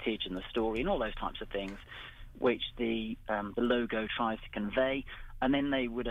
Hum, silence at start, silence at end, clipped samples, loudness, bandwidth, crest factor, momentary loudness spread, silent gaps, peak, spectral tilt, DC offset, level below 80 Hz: none; 0 s; 0 s; under 0.1%; -33 LUFS; 9.8 kHz; 16 dB; 10 LU; none; -18 dBFS; -7 dB/octave; under 0.1%; -48 dBFS